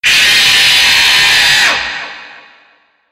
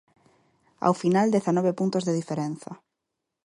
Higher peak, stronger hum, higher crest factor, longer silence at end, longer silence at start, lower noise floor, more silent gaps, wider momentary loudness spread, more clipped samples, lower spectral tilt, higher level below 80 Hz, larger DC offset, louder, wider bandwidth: first, 0 dBFS vs -6 dBFS; neither; second, 10 dB vs 20 dB; about the same, 0.8 s vs 0.7 s; second, 0.05 s vs 0.8 s; second, -50 dBFS vs -83 dBFS; neither; first, 14 LU vs 11 LU; neither; second, 1.5 dB/octave vs -7 dB/octave; first, -44 dBFS vs -70 dBFS; neither; first, -6 LUFS vs -25 LUFS; first, 16.5 kHz vs 11.5 kHz